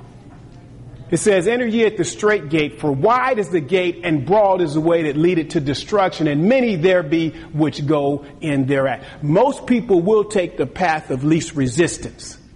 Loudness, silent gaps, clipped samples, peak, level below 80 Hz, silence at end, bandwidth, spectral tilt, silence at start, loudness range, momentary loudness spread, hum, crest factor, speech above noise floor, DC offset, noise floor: -18 LUFS; none; under 0.1%; -4 dBFS; -46 dBFS; 0.2 s; 11.5 kHz; -6 dB/octave; 0 s; 1 LU; 6 LU; none; 12 dB; 23 dB; under 0.1%; -40 dBFS